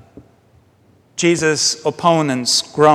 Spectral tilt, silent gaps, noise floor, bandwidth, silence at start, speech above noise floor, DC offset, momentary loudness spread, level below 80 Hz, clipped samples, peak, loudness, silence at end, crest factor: -3.5 dB/octave; none; -53 dBFS; 15 kHz; 0.15 s; 38 dB; under 0.1%; 4 LU; -58 dBFS; under 0.1%; 0 dBFS; -16 LUFS; 0 s; 18 dB